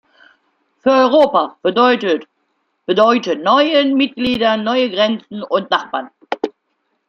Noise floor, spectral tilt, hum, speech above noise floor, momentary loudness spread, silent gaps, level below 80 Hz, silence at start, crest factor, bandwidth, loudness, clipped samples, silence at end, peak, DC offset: -68 dBFS; -5 dB/octave; none; 54 dB; 12 LU; none; -56 dBFS; 0.85 s; 14 dB; 7.2 kHz; -15 LUFS; under 0.1%; 0.6 s; -2 dBFS; under 0.1%